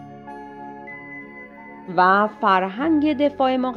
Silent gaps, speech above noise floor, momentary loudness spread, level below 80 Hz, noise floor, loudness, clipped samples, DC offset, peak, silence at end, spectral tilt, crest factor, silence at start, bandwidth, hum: none; 21 dB; 22 LU; -60 dBFS; -40 dBFS; -19 LUFS; under 0.1%; under 0.1%; -4 dBFS; 0 s; -7.5 dB/octave; 18 dB; 0 s; 6 kHz; none